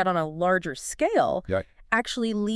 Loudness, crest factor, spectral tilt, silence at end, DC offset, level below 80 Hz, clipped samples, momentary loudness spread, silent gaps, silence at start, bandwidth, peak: -26 LUFS; 18 dB; -4.5 dB/octave; 0 s; under 0.1%; -52 dBFS; under 0.1%; 7 LU; none; 0 s; 12 kHz; -6 dBFS